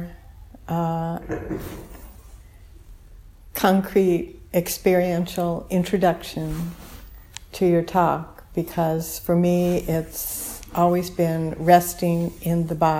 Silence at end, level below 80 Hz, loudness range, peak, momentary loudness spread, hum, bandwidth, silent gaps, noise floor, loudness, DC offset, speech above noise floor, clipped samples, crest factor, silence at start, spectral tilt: 0 s; -44 dBFS; 5 LU; -2 dBFS; 14 LU; none; 16.5 kHz; none; -45 dBFS; -23 LUFS; under 0.1%; 24 dB; under 0.1%; 22 dB; 0 s; -6 dB/octave